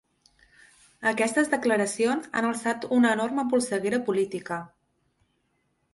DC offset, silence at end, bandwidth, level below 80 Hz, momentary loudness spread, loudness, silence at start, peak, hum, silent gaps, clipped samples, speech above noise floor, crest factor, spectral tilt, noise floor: under 0.1%; 1.25 s; 11.5 kHz; -70 dBFS; 7 LU; -26 LUFS; 1 s; -10 dBFS; none; none; under 0.1%; 47 dB; 18 dB; -4 dB/octave; -73 dBFS